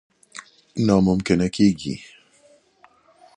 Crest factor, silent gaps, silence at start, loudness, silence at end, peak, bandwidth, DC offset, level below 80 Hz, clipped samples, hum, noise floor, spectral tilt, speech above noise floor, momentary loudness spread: 20 dB; none; 0.35 s; -20 LUFS; 1.3 s; -4 dBFS; 10.5 kHz; under 0.1%; -48 dBFS; under 0.1%; none; -56 dBFS; -6.5 dB/octave; 37 dB; 23 LU